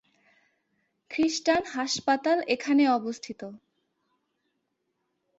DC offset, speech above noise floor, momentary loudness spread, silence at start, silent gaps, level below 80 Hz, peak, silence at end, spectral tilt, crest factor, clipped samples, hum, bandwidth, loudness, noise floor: under 0.1%; 52 dB; 16 LU; 1.1 s; none; -70 dBFS; -12 dBFS; 1.85 s; -3 dB/octave; 18 dB; under 0.1%; none; 8 kHz; -26 LUFS; -78 dBFS